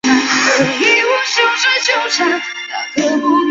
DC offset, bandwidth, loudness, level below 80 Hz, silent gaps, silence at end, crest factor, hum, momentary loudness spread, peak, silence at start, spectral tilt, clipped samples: under 0.1%; 7.8 kHz; -13 LUFS; -58 dBFS; none; 0 s; 14 dB; none; 8 LU; 0 dBFS; 0.05 s; -2 dB/octave; under 0.1%